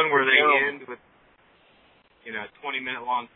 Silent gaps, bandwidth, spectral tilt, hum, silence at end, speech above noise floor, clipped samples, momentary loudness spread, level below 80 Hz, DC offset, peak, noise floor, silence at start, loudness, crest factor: none; 4.1 kHz; -6.5 dB/octave; none; 0.1 s; 35 dB; under 0.1%; 22 LU; -72 dBFS; under 0.1%; -4 dBFS; -59 dBFS; 0 s; -22 LUFS; 22 dB